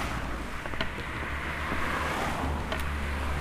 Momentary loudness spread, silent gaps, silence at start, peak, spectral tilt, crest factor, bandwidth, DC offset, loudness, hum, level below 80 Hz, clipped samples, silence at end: 5 LU; none; 0 s; -12 dBFS; -5 dB/octave; 18 dB; 15.5 kHz; under 0.1%; -32 LUFS; none; -36 dBFS; under 0.1%; 0 s